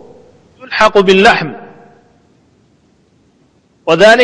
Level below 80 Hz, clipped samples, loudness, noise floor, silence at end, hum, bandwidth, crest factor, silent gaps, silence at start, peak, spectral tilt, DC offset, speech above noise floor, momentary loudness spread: -44 dBFS; 0.6%; -9 LUFS; -52 dBFS; 0 s; none; 11 kHz; 12 dB; none; 0.7 s; 0 dBFS; -4.5 dB/octave; under 0.1%; 45 dB; 17 LU